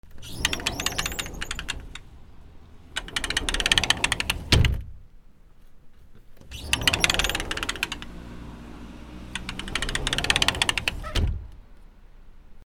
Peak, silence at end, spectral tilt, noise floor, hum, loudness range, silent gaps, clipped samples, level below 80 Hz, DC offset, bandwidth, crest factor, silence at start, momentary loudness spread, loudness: 0 dBFS; 0 s; -2.5 dB/octave; -48 dBFS; none; 5 LU; none; under 0.1%; -36 dBFS; under 0.1%; over 20 kHz; 28 dB; 0.05 s; 21 LU; -25 LUFS